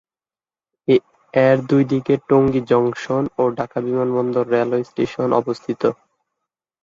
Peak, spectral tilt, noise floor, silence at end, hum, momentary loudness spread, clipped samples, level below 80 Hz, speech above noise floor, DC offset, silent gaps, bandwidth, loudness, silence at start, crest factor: -2 dBFS; -8 dB/octave; under -90 dBFS; 0.9 s; none; 7 LU; under 0.1%; -56 dBFS; over 72 dB; under 0.1%; none; 7.6 kHz; -19 LUFS; 0.9 s; 18 dB